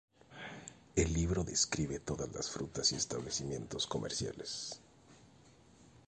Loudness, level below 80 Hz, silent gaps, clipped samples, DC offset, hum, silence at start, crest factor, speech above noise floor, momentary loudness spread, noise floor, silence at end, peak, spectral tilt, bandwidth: -36 LUFS; -50 dBFS; none; under 0.1%; under 0.1%; none; 0.3 s; 22 dB; 25 dB; 16 LU; -62 dBFS; 0.1 s; -16 dBFS; -3.5 dB/octave; 11 kHz